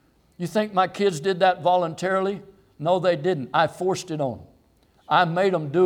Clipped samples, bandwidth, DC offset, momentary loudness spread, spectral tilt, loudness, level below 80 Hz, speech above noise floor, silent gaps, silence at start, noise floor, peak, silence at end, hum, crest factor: under 0.1%; 15 kHz; under 0.1%; 9 LU; -5.5 dB/octave; -23 LUFS; -64 dBFS; 38 dB; none; 0.4 s; -60 dBFS; -6 dBFS; 0 s; none; 18 dB